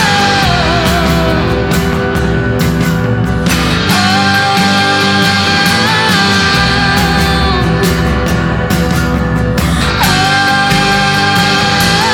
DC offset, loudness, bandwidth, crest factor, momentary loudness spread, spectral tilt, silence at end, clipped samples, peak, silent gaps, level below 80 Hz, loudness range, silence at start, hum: under 0.1%; -10 LUFS; over 20 kHz; 10 dB; 4 LU; -4.5 dB/octave; 0 s; under 0.1%; 0 dBFS; none; -22 dBFS; 3 LU; 0 s; none